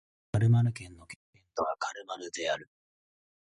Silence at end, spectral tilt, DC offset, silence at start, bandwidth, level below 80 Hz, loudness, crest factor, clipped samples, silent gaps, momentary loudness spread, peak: 0.95 s; -6 dB/octave; under 0.1%; 0.35 s; 11 kHz; -58 dBFS; -31 LUFS; 18 dB; under 0.1%; 1.16-1.33 s; 22 LU; -16 dBFS